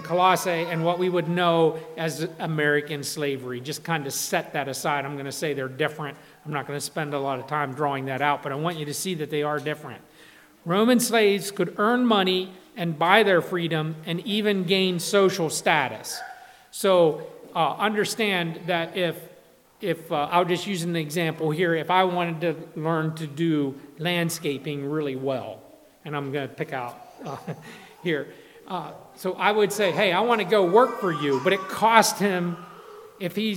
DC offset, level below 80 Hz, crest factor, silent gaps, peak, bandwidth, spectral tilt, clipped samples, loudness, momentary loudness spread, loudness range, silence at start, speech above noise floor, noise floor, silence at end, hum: under 0.1%; -74 dBFS; 24 dB; none; 0 dBFS; 18 kHz; -4.5 dB/octave; under 0.1%; -24 LUFS; 14 LU; 7 LU; 0 s; 29 dB; -53 dBFS; 0 s; none